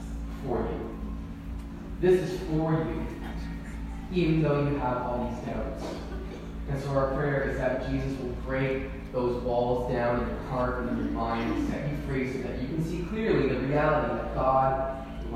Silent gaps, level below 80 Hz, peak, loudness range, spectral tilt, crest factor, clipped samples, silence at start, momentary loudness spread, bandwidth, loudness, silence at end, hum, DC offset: none; -40 dBFS; -12 dBFS; 3 LU; -8 dB/octave; 16 dB; under 0.1%; 0 s; 13 LU; 14.5 kHz; -29 LUFS; 0 s; none; under 0.1%